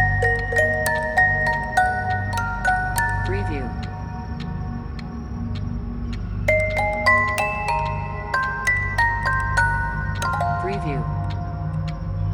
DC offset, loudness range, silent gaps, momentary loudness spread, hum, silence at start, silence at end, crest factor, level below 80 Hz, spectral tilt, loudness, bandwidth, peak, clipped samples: under 0.1%; 6 LU; none; 12 LU; 50 Hz at -35 dBFS; 0 s; 0 s; 18 dB; -32 dBFS; -5.5 dB/octave; -22 LUFS; 17.5 kHz; -4 dBFS; under 0.1%